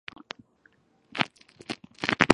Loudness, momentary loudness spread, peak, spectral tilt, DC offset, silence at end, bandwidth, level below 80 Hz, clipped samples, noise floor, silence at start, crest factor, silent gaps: -31 LUFS; 15 LU; 0 dBFS; -4.5 dB/octave; under 0.1%; 0 s; 11.5 kHz; -52 dBFS; under 0.1%; -64 dBFS; 1.15 s; 30 dB; none